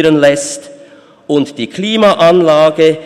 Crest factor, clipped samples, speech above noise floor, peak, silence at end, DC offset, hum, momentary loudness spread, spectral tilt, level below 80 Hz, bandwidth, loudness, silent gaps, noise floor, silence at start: 10 dB; under 0.1%; 30 dB; 0 dBFS; 0 s; under 0.1%; none; 11 LU; -4.5 dB/octave; -54 dBFS; 13 kHz; -10 LUFS; none; -39 dBFS; 0 s